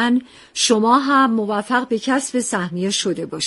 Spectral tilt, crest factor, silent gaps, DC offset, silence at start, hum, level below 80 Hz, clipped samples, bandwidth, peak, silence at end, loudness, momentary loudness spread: -3.5 dB/octave; 16 dB; none; under 0.1%; 0 s; none; -62 dBFS; under 0.1%; 11.5 kHz; -2 dBFS; 0 s; -18 LUFS; 8 LU